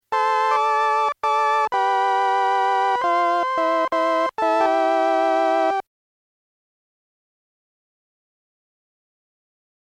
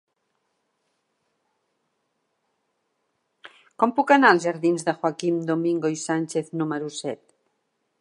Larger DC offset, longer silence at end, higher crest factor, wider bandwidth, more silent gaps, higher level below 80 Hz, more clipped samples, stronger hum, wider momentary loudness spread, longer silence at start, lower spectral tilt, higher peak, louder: neither; first, 4.05 s vs 0.85 s; second, 12 dB vs 24 dB; about the same, 12 kHz vs 11.5 kHz; neither; first, -70 dBFS vs -78 dBFS; neither; neither; second, 2 LU vs 13 LU; second, 0.1 s vs 3.45 s; second, -2.5 dB/octave vs -5 dB/octave; second, -10 dBFS vs -2 dBFS; first, -20 LUFS vs -23 LUFS